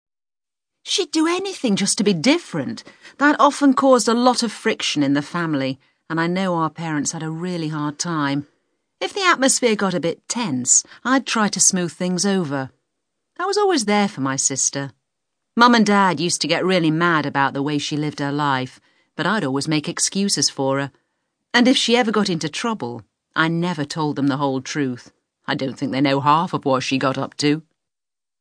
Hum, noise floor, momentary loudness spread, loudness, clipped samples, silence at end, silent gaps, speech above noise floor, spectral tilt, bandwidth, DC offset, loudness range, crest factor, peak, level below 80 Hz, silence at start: none; under -90 dBFS; 12 LU; -19 LUFS; under 0.1%; 0.8 s; none; over 71 dB; -3.5 dB/octave; 10.5 kHz; under 0.1%; 5 LU; 20 dB; 0 dBFS; -70 dBFS; 0.85 s